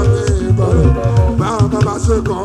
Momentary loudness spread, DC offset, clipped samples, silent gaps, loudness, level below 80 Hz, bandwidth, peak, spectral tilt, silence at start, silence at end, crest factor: 3 LU; under 0.1%; under 0.1%; none; -14 LUFS; -20 dBFS; 11 kHz; 0 dBFS; -7.5 dB/octave; 0 s; 0 s; 12 dB